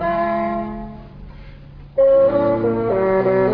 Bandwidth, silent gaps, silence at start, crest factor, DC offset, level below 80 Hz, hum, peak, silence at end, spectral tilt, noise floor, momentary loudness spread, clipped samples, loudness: 5.2 kHz; none; 0 s; 12 dB; under 0.1%; -40 dBFS; none; -6 dBFS; 0 s; -10.5 dB/octave; -38 dBFS; 17 LU; under 0.1%; -17 LUFS